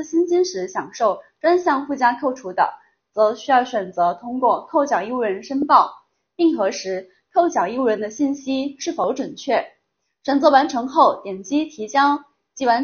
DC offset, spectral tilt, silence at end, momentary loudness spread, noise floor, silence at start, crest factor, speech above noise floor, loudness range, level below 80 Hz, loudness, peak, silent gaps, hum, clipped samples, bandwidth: under 0.1%; -2.5 dB/octave; 0 s; 9 LU; -71 dBFS; 0 s; 20 dB; 52 dB; 3 LU; -66 dBFS; -20 LUFS; 0 dBFS; none; none; under 0.1%; 6.8 kHz